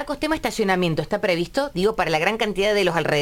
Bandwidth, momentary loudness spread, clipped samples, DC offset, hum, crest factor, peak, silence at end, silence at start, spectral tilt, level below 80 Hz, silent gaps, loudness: 17 kHz; 4 LU; under 0.1%; under 0.1%; none; 16 dB; -6 dBFS; 0 s; 0 s; -5 dB/octave; -44 dBFS; none; -21 LUFS